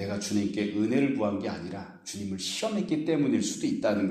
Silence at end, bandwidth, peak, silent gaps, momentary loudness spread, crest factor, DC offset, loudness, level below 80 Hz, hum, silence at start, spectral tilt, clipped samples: 0 s; 14.5 kHz; -14 dBFS; none; 11 LU; 14 dB; under 0.1%; -29 LUFS; -66 dBFS; none; 0 s; -5 dB/octave; under 0.1%